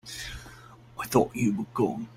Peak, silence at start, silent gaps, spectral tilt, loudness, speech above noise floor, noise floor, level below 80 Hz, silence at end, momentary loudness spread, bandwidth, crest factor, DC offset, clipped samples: -8 dBFS; 0.05 s; none; -5.5 dB/octave; -28 LUFS; 23 dB; -50 dBFS; -52 dBFS; 0 s; 19 LU; 16.5 kHz; 22 dB; under 0.1%; under 0.1%